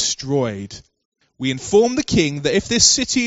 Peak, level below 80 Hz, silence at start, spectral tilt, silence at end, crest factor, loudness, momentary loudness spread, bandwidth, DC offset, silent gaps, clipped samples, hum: 0 dBFS; -44 dBFS; 0 s; -3 dB/octave; 0 s; 18 dB; -17 LUFS; 13 LU; 8.2 kHz; under 0.1%; 1.05-1.12 s; under 0.1%; none